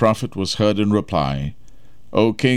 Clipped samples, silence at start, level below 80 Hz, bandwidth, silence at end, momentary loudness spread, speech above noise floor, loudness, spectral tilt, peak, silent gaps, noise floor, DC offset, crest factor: under 0.1%; 0 s; -42 dBFS; 14 kHz; 0 s; 8 LU; 31 dB; -20 LUFS; -6 dB/octave; -2 dBFS; none; -49 dBFS; 1%; 16 dB